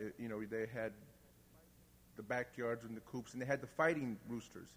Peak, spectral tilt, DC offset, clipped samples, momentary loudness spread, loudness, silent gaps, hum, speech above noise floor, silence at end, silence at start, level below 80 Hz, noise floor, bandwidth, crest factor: -20 dBFS; -6 dB/octave; under 0.1%; under 0.1%; 12 LU; -42 LUFS; none; 60 Hz at -70 dBFS; 24 dB; 0 s; 0 s; -72 dBFS; -66 dBFS; over 20 kHz; 24 dB